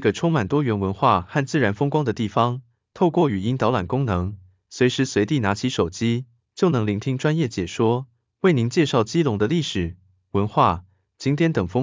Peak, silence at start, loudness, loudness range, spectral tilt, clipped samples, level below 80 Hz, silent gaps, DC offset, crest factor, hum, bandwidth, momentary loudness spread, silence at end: -4 dBFS; 0 s; -22 LUFS; 1 LU; -6.5 dB/octave; under 0.1%; -44 dBFS; none; under 0.1%; 18 dB; none; 7.6 kHz; 7 LU; 0 s